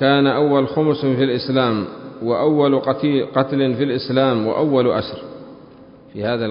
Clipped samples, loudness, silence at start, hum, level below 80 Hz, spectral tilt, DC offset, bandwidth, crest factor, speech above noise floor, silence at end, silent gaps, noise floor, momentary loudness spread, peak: under 0.1%; -18 LUFS; 0 s; none; -54 dBFS; -11.5 dB/octave; under 0.1%; 5.4 kHz; 16 dB; 26 dB; 0 s; none; -43 dBFS; 13 LU; -2 dBFS